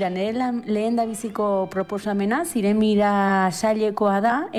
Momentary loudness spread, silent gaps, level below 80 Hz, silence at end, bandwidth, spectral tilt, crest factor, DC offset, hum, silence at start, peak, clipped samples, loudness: 6 LU; none; -58 dBFS; 0 s; 14.5 kHz; -5.5 dB/octave; 12 dB; under 0.1%; none; 0 s; -10 dBFS; under 0.1%; -22 LUFS